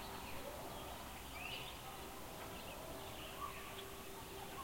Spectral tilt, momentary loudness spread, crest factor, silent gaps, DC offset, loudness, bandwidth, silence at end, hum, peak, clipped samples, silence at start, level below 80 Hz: -3 dB/octave; 4 LU; 14 dB; none; under 0.1%; -49 LUFS; 16.5 kHz; 0 s; none; -34 dBFS; under 0.1%; 0 s; -60 dBFS